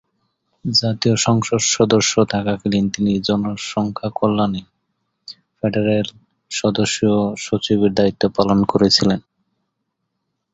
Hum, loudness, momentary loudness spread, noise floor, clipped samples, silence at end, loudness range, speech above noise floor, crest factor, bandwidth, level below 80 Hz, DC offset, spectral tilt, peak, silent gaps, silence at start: none; -18 LUFS; 10 LU; -75 dBFS; under 0.1%; 1.35 s; 4 LU; 57 dB; 18 dB; 8.2 kHz; -48 dBFS; under 0.1%; -4.5 dB/octave; 0 dBFS; none; 0.65 s